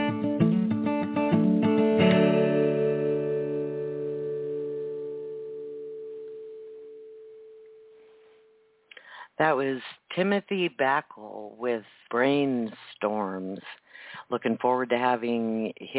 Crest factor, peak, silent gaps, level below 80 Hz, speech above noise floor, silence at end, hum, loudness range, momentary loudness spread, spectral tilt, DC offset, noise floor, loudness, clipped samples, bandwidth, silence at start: 18 dB; -10 dBFS; none; -66 dBFS; 34 dB; 0 s; none; 17 LU; 20 LU; -10.5 dB/octave; under 0.1%; -62 dBFS; -27 LUFS; under 0.1%; 4 kHz; 0 s